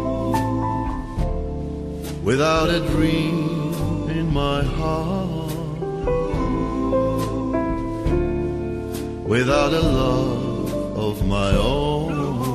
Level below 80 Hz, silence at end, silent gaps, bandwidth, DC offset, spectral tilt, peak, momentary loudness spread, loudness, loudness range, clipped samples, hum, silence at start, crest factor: -30 dBFS; 0 s; none; 14 kHz; under 0.1%; -6.5 dB/octave; -4 dBFS; 9 LU; -22 LUFS; 3 LU; under 0.1%; none; 0 s; 16 dB